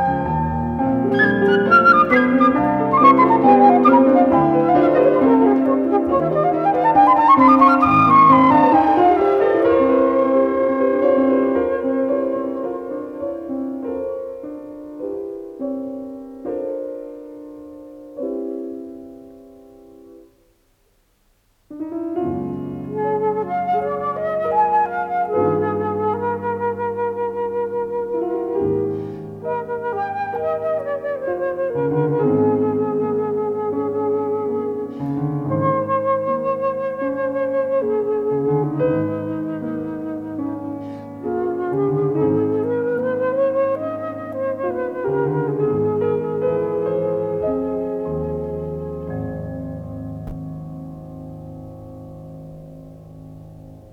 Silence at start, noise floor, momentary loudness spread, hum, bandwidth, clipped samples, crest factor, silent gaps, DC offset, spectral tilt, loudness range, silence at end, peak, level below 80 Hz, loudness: 0 s; -61 dBFS; 19 LU; none; 5.8 kHz; under 0.1%; 18 dB; none; under 0.1%; -9 dB/octave; 17 LU; 0.05 s; 0 dBFS; -50 dBFS; -18 LUFS